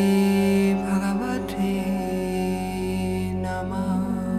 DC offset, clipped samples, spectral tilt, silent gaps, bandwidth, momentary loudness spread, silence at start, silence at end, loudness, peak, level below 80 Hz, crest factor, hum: under 0.1%; under 0.1%; -7 dB/octave; none; 14.5 kHz; 7 LU; 0 s; 0 s; -24 LUFS; -12 dBFS; -42 dBFS; 12 dB; none